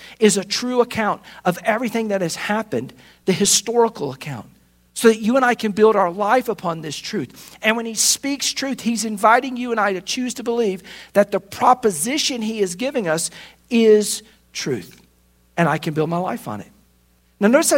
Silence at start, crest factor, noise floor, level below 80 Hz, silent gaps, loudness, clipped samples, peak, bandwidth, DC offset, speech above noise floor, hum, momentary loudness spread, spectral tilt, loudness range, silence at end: 0 s; 20 dB; -58 dBFS; -60 dBFS; none; -19 LUFS; under 0.1%; 0 dBFS; 16.5 kHz; under 0.1%; 39 dB; none; 12 LU; -3.5 dB/octave; 3 LU; 0 s